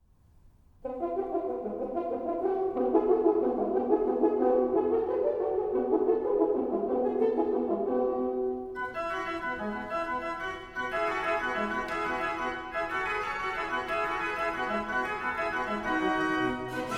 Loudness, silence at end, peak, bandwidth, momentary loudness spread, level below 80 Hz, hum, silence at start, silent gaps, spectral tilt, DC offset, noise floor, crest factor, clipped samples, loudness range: -30 LUFS; 0 s; -12 dBFS; 12.5 kHz; 7 LU; -56 dBFS; none; 0.45 s; none; -5.5 dB/octave; under 0.1%; -59 dBFS; 18 dB; under 0.1%; 5 LU